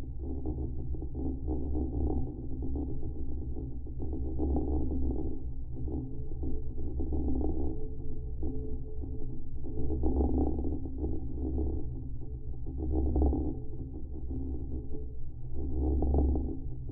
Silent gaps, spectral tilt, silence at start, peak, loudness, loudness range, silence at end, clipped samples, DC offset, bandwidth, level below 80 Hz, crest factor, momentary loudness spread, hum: none; -15 dB/octave; 0 s; -16 dBFS; -36 LUFS; 2 LU; 0 s; under 0.1%; under 0.1%; 1.1 kHz; -34 dBFS; 16 dB; 12 LU; none